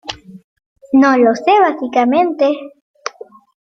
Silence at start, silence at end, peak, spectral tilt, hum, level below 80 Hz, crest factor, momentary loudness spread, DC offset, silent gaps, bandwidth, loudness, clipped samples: 0.05 s; 0.5 s; -2 dBFS; -4.5 dB/octave; none; -58 dBFS; 14 dB; 18 LU; under 0.1%; 0.44-0.56 s, 0.66-0.76 s, 2.81-2.94 s; 7.2 kHz; -13 LUFS; under 0.1%